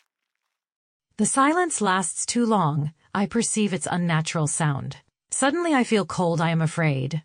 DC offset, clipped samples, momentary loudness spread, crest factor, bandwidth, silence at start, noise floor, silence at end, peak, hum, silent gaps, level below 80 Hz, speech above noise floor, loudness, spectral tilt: under 0.1%; under 0.1%; 6 LU; 16 dB; 10 kHz; 1.2 s; -82 dBFS; 0.05 s; -8 dBFS; none; none; -62 dBFS; 59 dB; -23 LUFS; -4.5 dB/octave